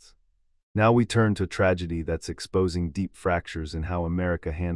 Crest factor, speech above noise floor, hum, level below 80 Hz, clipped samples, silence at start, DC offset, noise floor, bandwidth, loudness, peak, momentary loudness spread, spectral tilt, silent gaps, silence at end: 16 dB; 41 dB; none; -44 dBFS; under 0.1%; 0.75 s; under 0.1%; -66 dBFS; 12 kHz; -26 LUFS; -10 dBFS; 10 LU; -6.5 dB/octave; none; 0 s